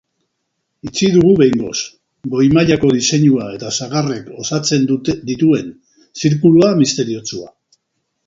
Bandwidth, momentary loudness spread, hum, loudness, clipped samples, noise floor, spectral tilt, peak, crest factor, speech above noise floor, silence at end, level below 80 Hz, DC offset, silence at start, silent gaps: 7.8 kHz; 14 LU; none; -14 LUFS; under 0.1%; -72 dBFS; -5.5 dB/octave; 0 dBFS; 14 dB; 58 dB; 0.8 s; -48 dBFS; under 0.1%; 0.85 s; none